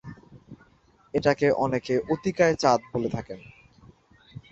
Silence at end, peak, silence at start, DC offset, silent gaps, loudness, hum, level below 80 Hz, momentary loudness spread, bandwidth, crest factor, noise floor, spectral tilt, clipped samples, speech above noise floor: 0.15 s; -6 dBFS; 0.05 s; under 0.1%; none; -25 LUFS; none; -56 dBFS; 16 LU; 8.2 kHz; 22 dB; -60 dBFS; -6 dB/octave; under 0.1%; 36 dB